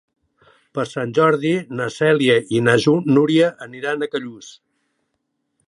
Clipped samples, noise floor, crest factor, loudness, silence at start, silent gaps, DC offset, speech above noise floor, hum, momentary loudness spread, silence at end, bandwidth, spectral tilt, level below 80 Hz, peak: under 0.1%; -73 dBFS; 18 dB; -18 LUFS; 0.75 s; none; under 0.1%; 56 dB; none; 12 LU; 1.15 s; 11.5 kHz; -6 dB/octave; -64 dBFS; -2 dBFS